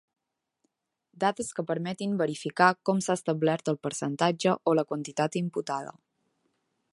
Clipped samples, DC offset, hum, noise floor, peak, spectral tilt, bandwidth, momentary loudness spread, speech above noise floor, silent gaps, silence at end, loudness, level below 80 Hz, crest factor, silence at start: under 0.1%; under 0.1%; none; -78 dBFS; -6 dBFS; -5 dB/octave; 11.5 kHz; 9 LU; 50 dB; none; 1 s; -28 LUFS; -74 dBFS; 24 dB; 1.2 s